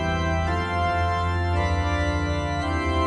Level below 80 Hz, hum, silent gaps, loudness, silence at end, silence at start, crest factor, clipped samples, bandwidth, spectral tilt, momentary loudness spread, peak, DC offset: -32 dBFS; none; none; -24 LUFS; 0 s; 0 s; 12 dB; under 0.1%; 10 kHz; -6.5 dB/octave; 2 LU; -12 dBFS; under 0.1%